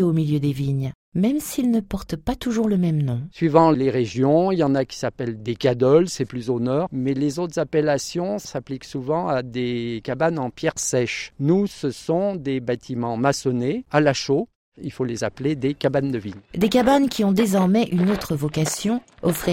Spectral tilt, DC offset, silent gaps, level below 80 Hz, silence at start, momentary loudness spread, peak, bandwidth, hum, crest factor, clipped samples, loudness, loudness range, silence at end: -6 dB/octave; under 0.1%; 0.95-1.12 s, 14.55-14.72 s; -48 dBFS; 0 s; 9 LU; 0 dBFS; 16.5 kHz; none; 20 dB; under 0.1%; -22 LUFS; 4 LU; 0 s